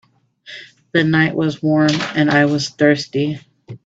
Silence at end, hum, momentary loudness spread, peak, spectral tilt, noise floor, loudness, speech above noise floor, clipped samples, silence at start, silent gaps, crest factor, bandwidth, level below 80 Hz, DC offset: 0.1 s; none; 20 LU; 0 dBFS; -6 dB/octave; -43 dBFS; -16 LUFS; 27 dB; under 0.1%; 0.45 s; none; 18 dB; 8 kHz; -56 dBFS; under 0.1%